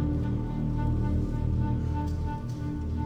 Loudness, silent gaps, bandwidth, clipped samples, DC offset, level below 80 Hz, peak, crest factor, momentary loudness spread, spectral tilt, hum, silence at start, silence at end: -30 LUFS; none; 7.8 kHz; under 0.1%; under 0.1%; -36 dBFS; -16 dBFS; 12 dB; 5 LU; -9.5 dB/octave; none; 0 s; 0 s